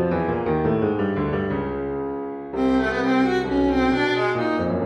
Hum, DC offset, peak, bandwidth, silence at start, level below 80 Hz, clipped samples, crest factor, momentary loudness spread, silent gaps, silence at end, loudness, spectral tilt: none; under 0.1%; -10 dBFS; 8.6 kHz; 0 s; -42 dBFS; under 0.1%; 12 dB; 7 LU; none; 0 s; -22 LUFS; -7.5 dB/octave